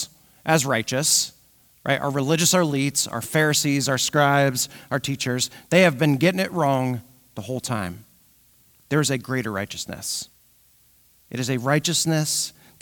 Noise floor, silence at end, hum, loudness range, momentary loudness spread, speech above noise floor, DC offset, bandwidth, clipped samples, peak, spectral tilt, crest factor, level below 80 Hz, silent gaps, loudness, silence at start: -58 dBFS; 0.3 s; none; 7 LU; 12 LU; 36 dB; under 0.1%; 19 kHz; under 0.1%; -4 dBFS; -3.5 dB/octave; 20 dB; -62 dBFS; none; -22 LUFS; 0 s